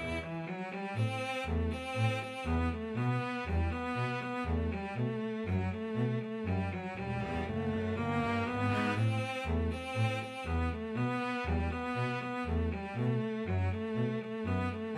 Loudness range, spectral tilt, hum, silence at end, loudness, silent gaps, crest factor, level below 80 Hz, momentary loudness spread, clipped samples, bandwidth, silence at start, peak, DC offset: 2 LU; -7 dB/octave; none; 0 s; -35 LUFS; none; 14 dB; -46 dBFS; 4 LU; under 0.1%; 11 kHz; 0 s; -20 dBFS; under 0.1%